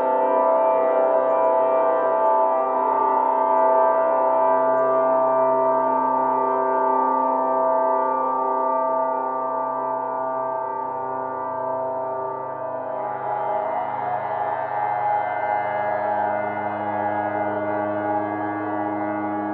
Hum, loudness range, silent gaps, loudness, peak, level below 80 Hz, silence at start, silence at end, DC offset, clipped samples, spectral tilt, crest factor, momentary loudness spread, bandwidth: none; 7 LU; none; -22 LUFS; -8 dBFS; -78 dBFS; 0 s; 0 s; under 0.1%; under 0.1%; -9.5 dB/octave; 14 dB; 8 LU; 4.1 kHz